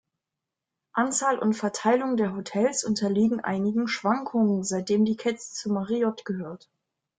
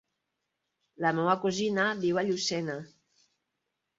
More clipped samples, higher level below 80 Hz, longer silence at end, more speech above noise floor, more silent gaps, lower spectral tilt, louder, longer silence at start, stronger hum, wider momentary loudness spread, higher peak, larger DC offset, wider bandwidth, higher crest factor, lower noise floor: neither; about the same, -68 dBFS vs -72 dBFS; second, 0.65 s vs 1.1 s; first, 62 dB vs 55 dB; neither; about the same, -5 dB/octave vs -4.5 dB/octave; first, -26 LUFS vs -29 LUFS; about the same, 0.95 s vs 1 s; neither; about the same, 9 LU vs 7 LU; about the same, -10 dBFS vs -10 dBFS; neither; first, 9.6 kHz vs 7.8 kHz; about the same, 16 dB vs 20 dB; first, -87 dBFS vs -83 dBFS